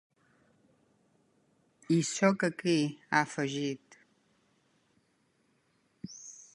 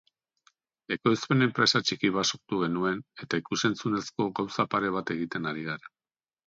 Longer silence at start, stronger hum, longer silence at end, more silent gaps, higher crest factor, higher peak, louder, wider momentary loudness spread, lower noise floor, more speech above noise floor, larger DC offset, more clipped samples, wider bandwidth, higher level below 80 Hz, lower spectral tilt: first, 1.9 s vs 0.9 s; neither; second, 0.15 s vs 0.7 s; neither; about the same, 24 dB vs 20 dB; about the same, -10 dBFS vs -8 dBFS; about the same, -30 LUFS vs -28 LUFS; first, 19 LU vs 9 LU; second, -73 dBFS vs under -90 dBFS; second, 43 dB vs over 62 dB; neither; neither; first, 11.5 kHz vs 7.8 kHz; second, -78 dBFS vs -66 dBFS; about the same, -5 dB/octave vs -4.5 dB/octave